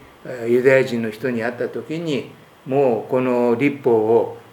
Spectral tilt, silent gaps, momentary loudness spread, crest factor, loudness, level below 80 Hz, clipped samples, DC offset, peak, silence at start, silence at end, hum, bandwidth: -7 dB/octave; none; 11 LU; 18 dB; -19 LUFS; -66 dBFS; under 0.1%; under 0.1%; -2 dBFS; 0.25 s; 0.1 s; none; 18 kHz